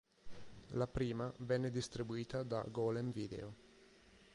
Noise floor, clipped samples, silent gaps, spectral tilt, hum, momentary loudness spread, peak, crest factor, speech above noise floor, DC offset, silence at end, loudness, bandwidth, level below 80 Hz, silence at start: -65 dBFS; under 0.1%; none; -6.5 dB/octave; none; 18 LU; -24 dBFS; 18 dB; 25 dB; under 0.1%; 0.1 s; -42 LUFS; 11 kHz; -62 dBFS; 0.25 s